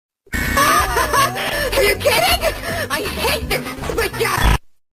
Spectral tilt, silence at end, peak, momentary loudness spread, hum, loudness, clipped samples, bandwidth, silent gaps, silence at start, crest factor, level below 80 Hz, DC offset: -3 dB/octave; 0.25 s; -2 dBFS; 8 LU; none; -17 LUFS; under 0.1%; 16 kHz; none; 0.3 s; 16 dB; -28 dBFS; under 0.1%